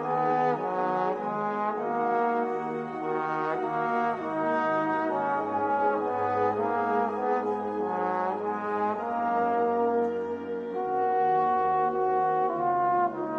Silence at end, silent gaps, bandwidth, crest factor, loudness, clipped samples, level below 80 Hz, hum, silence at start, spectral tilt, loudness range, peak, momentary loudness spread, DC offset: 0 s; none; 6.8 kHz; 14 dB; -27 LUFS; under 0.1%; -70 dBFS; none; 0 s; -8 dB/octave; 2 LU; -14 dBFS; 5 LU; under 0.1%